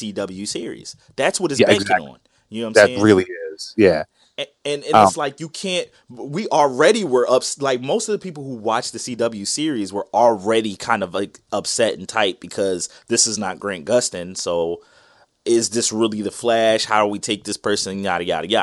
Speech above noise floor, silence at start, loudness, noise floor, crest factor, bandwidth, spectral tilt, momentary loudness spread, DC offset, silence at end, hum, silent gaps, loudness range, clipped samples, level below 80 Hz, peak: 35 dB; 0 s; -19 LUFS; -54 dBFS; 20 dB; 12 kHz; -3.5 dB/octave; 13 LU; under 0.1%; 0 s; none; none; 4 LU; under 0.1%; -60 dBFS; 0 dBFS